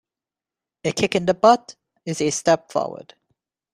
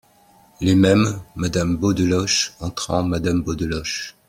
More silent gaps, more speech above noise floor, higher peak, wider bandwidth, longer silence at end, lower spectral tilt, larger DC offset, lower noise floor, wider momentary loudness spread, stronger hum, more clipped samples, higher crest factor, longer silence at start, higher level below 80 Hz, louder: neither; first, 70 dB vs 34 dB; about the same, -2 dBFS vs -2 dBFS; second, 13.5 kHz vs 16 kHz; first, 0.75 s vs 0.15 s; about the same, -4 dB/octave vs -5 dB/octave; neither; first, -89 dBFS vs -53 dBFS; first, 15 LU vs 9 LU; neither; neither; about the same, 20 dB vs 18 dB; first, 0.85 s vs 0.6 s; second, -60 dBFS vs -44 dBFS; about the same, -21 LUFS vs -20 LUFS